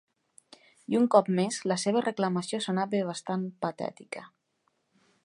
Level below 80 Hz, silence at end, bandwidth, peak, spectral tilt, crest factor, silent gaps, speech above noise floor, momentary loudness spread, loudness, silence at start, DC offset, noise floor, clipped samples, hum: -80 dBFS; 1 s; 11 kHz; -8 dBFS; -5.5 dB/octave; 22 dB; none; 47 dB; 17 LU; -28 LUFS; 0.9 s; under 0.1%; -75 dBFS; under 0.1%; none